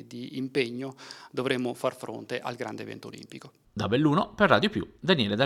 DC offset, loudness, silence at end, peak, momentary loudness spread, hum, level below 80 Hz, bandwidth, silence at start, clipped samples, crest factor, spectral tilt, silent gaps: under 0.1%; -28 LUFS; 0 s; -6 dBFS; 19 LU; none; -60 dBFS; 14.5 kHz; 0 s; under 0.1%; 22 dB; -6 dB/octave; none